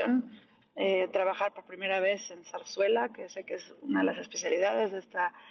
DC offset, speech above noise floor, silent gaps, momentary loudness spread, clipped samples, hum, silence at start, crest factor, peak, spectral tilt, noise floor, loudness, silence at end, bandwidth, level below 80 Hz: under 0.1%; 24 dB; none; 13 LU; under 0.1%; none; 0 s; 16 dB; -16 dBFS; -3.5 dB/octave; -55 dBFS; -31 LUFS; 0 s; 7 kHz; -82 dBFS